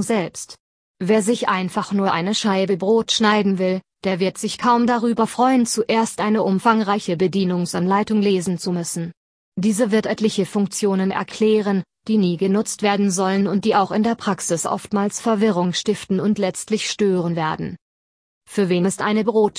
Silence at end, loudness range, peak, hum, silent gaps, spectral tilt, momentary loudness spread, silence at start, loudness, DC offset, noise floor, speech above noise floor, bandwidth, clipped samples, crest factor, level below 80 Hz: 0.1 s; 3 LU; -2 dBFS; none; 0.60-0.95 s, 9.17-9.52 s, 17.81-18.41 s; -5 dB/octave; 6 LU; 0 s; -20 LUFS; under 0.1%; under -90 dBFS; over 71 dB; 11 kHz; under 0.1%; 18 dB; -60 dBFS